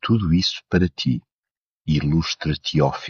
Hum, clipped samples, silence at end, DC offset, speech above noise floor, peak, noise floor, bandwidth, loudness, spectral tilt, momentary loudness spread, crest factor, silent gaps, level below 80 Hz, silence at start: none; under 0.1%; 0 s; under 0.1%; over 70 dB; -4 dBFS; under -90 dBFS; 7.2 kHz; -21 LUFS; -5.5 dB/octave; 5 LU; 16 dB; 1.32-1.43 s, 1.57-1.81 s; -38 dBFS; 0.05 s